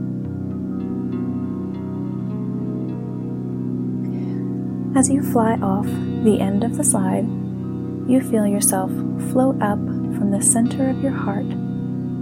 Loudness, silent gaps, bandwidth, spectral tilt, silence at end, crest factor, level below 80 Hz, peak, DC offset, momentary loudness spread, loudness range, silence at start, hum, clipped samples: -21 LUFS; none; 16.5 kHz; -6 dB/octave; 0 s; 18 dB; -56 dBFS; -4 dBFS; under 0.1%; 10 LU; 7 LU; 0 s; none; under 0.1%